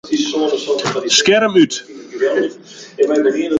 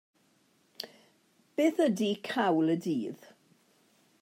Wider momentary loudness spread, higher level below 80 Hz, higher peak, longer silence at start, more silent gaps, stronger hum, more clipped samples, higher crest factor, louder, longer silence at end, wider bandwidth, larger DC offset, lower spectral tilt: second, 14 LU vs 17 LU; first, -60 dBFS vs -86 dBFS; first, 0 dBFS vs -14 dBFS; second, 0.05 s vs 0.8 s; neither; neither; neither; about the same, 16 dB vs 18 dB; first, -15 LUFS vs -30 LUFS; second, 0 s vs 1.05 s; second, 9.4 kHz vs 16 kHz; neither; second, -3 dB/octave vs -5.5 dB/octave